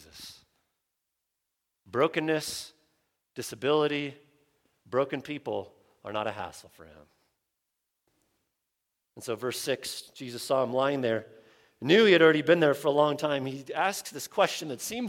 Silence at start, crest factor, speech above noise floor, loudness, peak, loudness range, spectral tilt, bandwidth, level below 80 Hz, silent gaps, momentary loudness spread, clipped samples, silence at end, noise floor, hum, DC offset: 0.15 s; 22 dB; 56 dB; -27 LUFS; -8 dBFS; 16 LU; -4.5 dB/octave; 17 kHz; -72 dBFS; none; 18 LU; under 0.1%; 0 s; -84 dBFS; none; under 0.1%